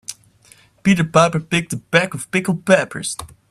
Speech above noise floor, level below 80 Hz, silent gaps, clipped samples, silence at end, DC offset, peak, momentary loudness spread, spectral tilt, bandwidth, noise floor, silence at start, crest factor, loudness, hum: 33 dB; -52 dBFS; none; under 0.1%; 0.25 s; under 0.1%; 0 dBFS; 11 LU; -5 dB/octave; 14 kHz; -51 dBFS; 0.1 s; 18 dB; -18 LUFS; none